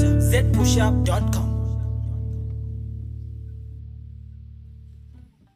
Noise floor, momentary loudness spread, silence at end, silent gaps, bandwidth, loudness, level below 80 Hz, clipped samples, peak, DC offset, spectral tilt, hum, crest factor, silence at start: -47 dBFS; 24 LU; 0.35 s; none; 15.5 kHz; -23 LUFS; -28 dBFS; under 0.1%; -6 dBFS; under 0.1%; -6 dB/octave; none; 16 dB; 0 s